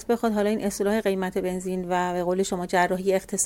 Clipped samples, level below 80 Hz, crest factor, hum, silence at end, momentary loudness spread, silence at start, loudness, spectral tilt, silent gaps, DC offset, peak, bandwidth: under 0.1%; -52 dBFS; 18 dB; none; 0 s; 4 LU; 0 s; -25 LUFS; -4.5 dB/octave; none; under 0.1%; -8 dBFS; 17 kHz